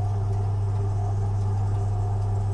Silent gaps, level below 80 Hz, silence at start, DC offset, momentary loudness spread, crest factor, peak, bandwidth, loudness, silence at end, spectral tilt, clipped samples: none; -36 dBFS; 0 s; under 0.1%; 0 LU; 8 dB; -16 dBFS; 8.6 kHz; -26 LUFS; 0 s; -8.5 dB/octave; under 0.1%